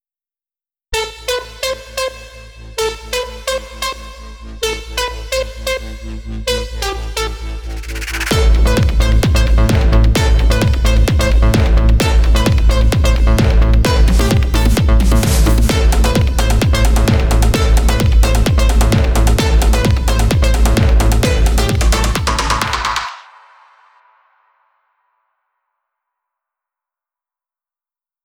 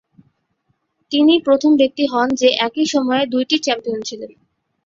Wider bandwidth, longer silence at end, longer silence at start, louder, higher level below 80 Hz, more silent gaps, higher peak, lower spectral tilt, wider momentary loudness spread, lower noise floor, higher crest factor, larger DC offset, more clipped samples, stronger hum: first, 17 kHz vs 7.6 kHz; first, 5.05 s vs 0.6 s; second, 0.9 s vs 1.1 s; about the same, -14 LUFS vs -16 LUFS; first, -14 dBFS vs -60 dBFS; neither; about the same, -2 dBFS vs -2 dBFS; first, -5 dB/octave vs -3 dB/octave; about the same, 10 LU vs 12 LU; first, under -90 dBFS vs -67 dBFS; about the same, 12 dB vs 16 dB; neither; neither; neither